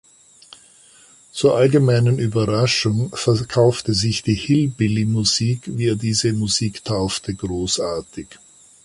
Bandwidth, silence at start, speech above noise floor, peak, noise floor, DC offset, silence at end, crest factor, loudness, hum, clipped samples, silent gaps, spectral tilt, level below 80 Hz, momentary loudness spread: 11.5 kHz; 1.35 s; 31 dB; -4 dBFS; -49 dBFS; under 0.1%; 0.5 s; 16 dB; -19 LUFS; none; under 0.1%; none; -5 dB/octave; -46 dBFS; 9 LU